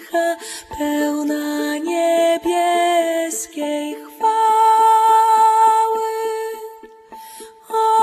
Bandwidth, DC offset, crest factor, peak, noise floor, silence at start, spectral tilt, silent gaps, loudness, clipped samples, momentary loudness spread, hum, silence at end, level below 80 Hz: 14 kHz; under 0.1%; 12 dB; -4 dBFS; -39 dBFS; 0 s; -2 dB/octave; none; -17 LUFS; under 0.1%; 16 LU; none; 0 s; -58 dBFS